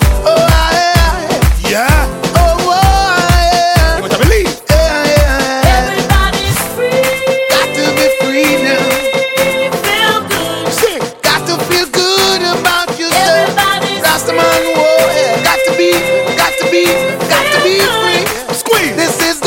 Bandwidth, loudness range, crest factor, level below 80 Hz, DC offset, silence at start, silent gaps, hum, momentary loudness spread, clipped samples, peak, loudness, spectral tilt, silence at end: 17.5 kHz; 1 LU; 10 dB; -20 dBFS; under 0.1%; 0 s; none; none; 4 LU; under 0.1%; 0 dBFS; -11 LUFS; -4 dB/octave; 0 s